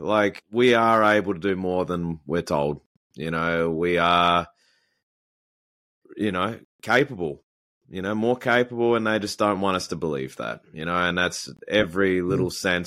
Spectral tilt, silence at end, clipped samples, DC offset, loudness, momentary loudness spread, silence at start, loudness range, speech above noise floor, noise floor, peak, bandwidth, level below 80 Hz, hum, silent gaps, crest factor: -5 dB/octave; 0 s; under 0.1%; under 0.1%; -23 LUFS; 14 LU; 0 s; 5 LU; over 67 dB; under -90 dBFS; -6 dBFS; 15.5 kHz; -54 dBFS; none; 2.86-3.10 s, 5.03-6.02 s, 6.65-6.79 s, 7.43-7.81 s; 18 dB